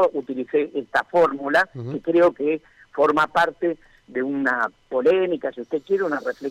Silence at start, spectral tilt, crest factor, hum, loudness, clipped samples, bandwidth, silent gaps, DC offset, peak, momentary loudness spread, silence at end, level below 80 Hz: 0 s; -6 dB/octave; 12 dB; none; -22 LUFS; under 0.1%; 12 kHz; none; under 0.1%; -10 dBFS; 10 LU; 0 s; -62 dBFS